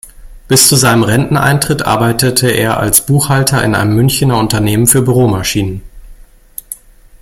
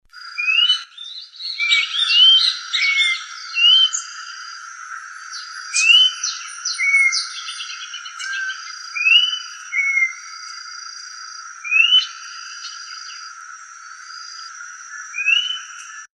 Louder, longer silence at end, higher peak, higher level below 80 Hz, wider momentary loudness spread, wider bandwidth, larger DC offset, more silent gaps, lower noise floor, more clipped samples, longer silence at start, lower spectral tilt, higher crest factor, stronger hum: first, -10 LUFS vs -15 LUFS; first, 0.45 s vs 0.1 s; about the same, 0 dBFS vs -2 dBFS; first, -34 dBFS vs -82 dBFS; second, 18 LU vs 22 LU; first, over 20 kHz vs 11 kHz; neither; neither; about the same, -36 dBFS vs -38 dBFS; first, 0.2% vs under 0.1%; about the same, 0.05 s vs 0.15 s; first, -4 dB/octave vs 11.5 dB/octave; second, 12 dB vs 18 dB; neither